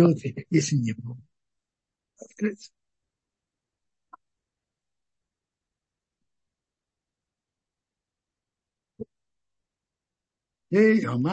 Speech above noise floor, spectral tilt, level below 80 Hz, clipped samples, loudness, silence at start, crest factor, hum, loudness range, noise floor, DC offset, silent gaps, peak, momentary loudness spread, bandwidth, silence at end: 66 dB; -6.5 dB/octave; -74 dBFS; under 0.1%; -24 LUFS; 0 s; 22 dB; none; 24 LU; -90 dBFS; under 0.1%; none; -8 dBFS; 24 LU; 8.6 kHz; 0 s